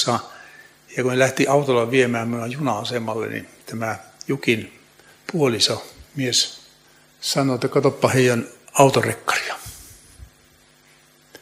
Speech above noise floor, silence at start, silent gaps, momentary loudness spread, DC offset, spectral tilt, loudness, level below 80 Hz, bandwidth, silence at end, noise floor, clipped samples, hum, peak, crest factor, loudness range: 34 dB; 0 s; none; 16 LU; under 0.1%; -4 dB/octave; -21 LUFS; -58 dBFS; 16 kHz; 0.05 s; -54 dBFS; under 0.1%; none; 0 dBFS; 22 dB; 4 LU